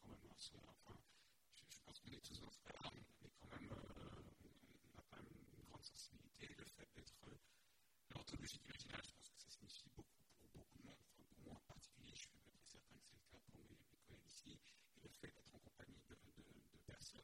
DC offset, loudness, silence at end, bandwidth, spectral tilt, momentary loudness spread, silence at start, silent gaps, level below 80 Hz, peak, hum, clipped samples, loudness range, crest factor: under 0.1%; -62 LUFS; 0 s; 16 kHz; -3.5 dB/octave; 12 LU; 0 s; none; -74 dBFS; -40 dBFS; none; under 0.1%; 7 LU; 24 dB